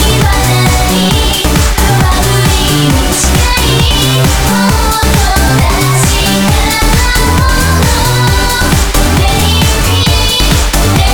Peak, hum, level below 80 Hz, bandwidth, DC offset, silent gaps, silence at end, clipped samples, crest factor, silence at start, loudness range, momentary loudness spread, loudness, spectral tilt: 0 dBFS; none; -14 dBFS; over 20 kHz; under 0.1%; none; 0 s; under 0.1%; 8 dB; 0 s; 0 LU; 1 LU; -9 LUFS; -4 dB/octave